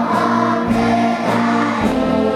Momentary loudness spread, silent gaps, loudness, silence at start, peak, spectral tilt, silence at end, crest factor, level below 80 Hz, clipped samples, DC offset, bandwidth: 1 LU; none; -16 LUFS; 0 s; -4 dBFS; -6 dB/octave; 0 s; 12 dB; -40 dBFS; under 0.1%; under 0.1%; 13 kHz